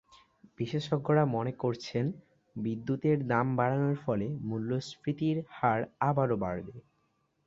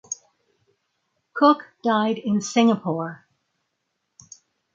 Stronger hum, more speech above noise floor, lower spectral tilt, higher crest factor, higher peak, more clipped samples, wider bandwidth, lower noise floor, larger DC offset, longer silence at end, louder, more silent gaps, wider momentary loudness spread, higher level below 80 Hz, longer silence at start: neither; second, 44 dB vs 56 dB; first, -8 dB/octave vs -5 dB/octave; about the same, 20 dB vs 20 dB; second, -12 dBFS vs -4 dBFS; neither; about the same, 7.8 kHz vs 7.8 kHz; about the same, -75 dBFS vs -77 dBFS; neither; second, 0.65 s vs 1.6 s; second, -31 LUFS vs -21 LUFS; neither; second, 9 LU vs 16 LU; first, -64 dBFS vs -72 dBFS; first, 0.6 s vs 0.1 s